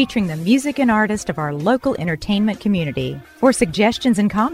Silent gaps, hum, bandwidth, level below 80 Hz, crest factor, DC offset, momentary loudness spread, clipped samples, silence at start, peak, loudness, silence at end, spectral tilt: none; none; 15 kHz; -44 dBFS; 16 dB; under 0.1%; 6 LU; under 0.1%; 0 s; -2 dBFS; -18 LUFS; 0 s; -5.5 dB/octave